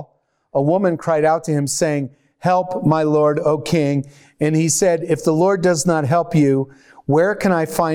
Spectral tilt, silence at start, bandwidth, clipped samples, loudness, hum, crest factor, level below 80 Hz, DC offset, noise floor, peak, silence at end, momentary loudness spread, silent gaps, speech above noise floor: -5.5 dB/octave; 0 s; 17.5 kHz; under 0.1%; -17 LUFS; none; 14 dB; -52 dBFS; under 0.1%; -58 dBFS; -4 dBFS; 0 s; 8 LU; none; 41 dB